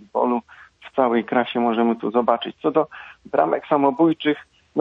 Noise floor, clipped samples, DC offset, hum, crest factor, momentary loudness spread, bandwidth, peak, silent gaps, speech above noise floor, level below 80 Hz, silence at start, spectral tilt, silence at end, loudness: -45 dBFS; under 0.1%; under 0.1%; none; 18 dB; 9 LU; 5 kHz; -4 dBFS; none; 25 dB; -66 dBFS; 0.15 s; -8 dB/octave; 0 s; -21 LUFS